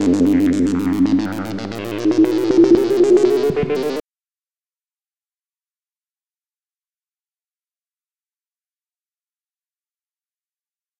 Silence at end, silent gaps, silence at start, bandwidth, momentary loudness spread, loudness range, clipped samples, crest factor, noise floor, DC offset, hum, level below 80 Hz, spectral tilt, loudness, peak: 7 s; none; 0 s; 17 kHz; 13 LU; 11 LU; under 0.1%; 18 dB; under -90 dBFS; under 0.1%; none; -52 dBFS; -6.5 dB/octave; -16 LUFS; -2 dBFS